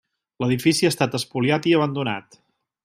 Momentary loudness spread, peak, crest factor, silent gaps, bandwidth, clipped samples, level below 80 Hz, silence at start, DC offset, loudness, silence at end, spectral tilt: 9 LU; -4 dBFS; 18 dB; none; 15.5 kHz; under 0.1%; -62 dBFS; 0.4 s; under 0.1%; -21 LUFS; 0.65 s; -5 dB/octave